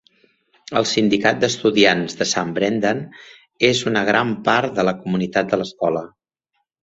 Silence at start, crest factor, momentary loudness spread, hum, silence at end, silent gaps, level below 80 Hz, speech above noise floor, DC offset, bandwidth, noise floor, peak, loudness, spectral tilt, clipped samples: 0.7 s; 18 dB; 7 LU; none; 0.75 s; none; -56 dBFS; 55 dB; under 0.1%; 8.2 kHz; -73 dBFS; -2 dBFS; -19 LUFS; -4 dB/octave; under 0.1%